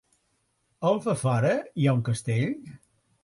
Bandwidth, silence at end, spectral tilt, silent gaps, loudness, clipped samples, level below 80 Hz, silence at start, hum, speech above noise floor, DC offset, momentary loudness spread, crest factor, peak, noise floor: 11.5 kHz; 0.45 s; -7 dB/octave; none; -26 LUFS; under 0.1%; -62 dBFS; 0.8 s; none; 47 dB; under 0.1%; 5 LU; 16 dB; -12 dBFS; -72 dBFS